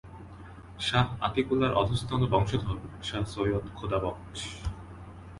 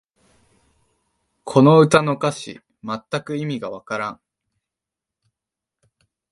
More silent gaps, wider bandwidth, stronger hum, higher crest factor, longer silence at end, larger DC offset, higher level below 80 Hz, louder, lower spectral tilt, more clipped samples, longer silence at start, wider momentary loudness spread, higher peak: neither; about the same, 11.5 kHz vs 11.5 kHz; neither; about the same, 20 dB vs 22 dB; second, 0 s vs 2.2 s; neither; first, -44 dBFS vs -62 dBFS; second, -30 LUFS vs -19 LUFS; about the same, -6 dB/octave vs -6.5 dB/octave; neither; second, 0.05 s vs 1.45 s; about the same, 20 LU vs 21 LU; second, -10 dBFS vs 0 dBFS